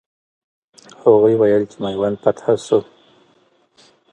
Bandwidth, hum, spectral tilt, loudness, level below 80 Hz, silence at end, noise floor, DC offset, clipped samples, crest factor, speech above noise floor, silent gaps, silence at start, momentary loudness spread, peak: 9.2 kHz; none; -7 dB/octave; -17 LUFS; -58 dBFS; 1.3 s; -58 dBFS; under 0.1%; under 0.1%; 18 dB; 42 dB; none; 1.05 s; 8 LU; 0 dBFS